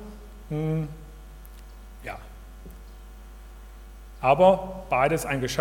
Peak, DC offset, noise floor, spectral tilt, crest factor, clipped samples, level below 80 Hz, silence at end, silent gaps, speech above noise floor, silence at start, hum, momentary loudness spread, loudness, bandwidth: -6 dBFS; under 0.1%; -43 dBFS; -6 dB/octave; 22 dB; under 0.1%; -44 dBFS; 0 s; none; 20 dB; 0 s; none; 27 LU; -24 LUFS; 18 kHz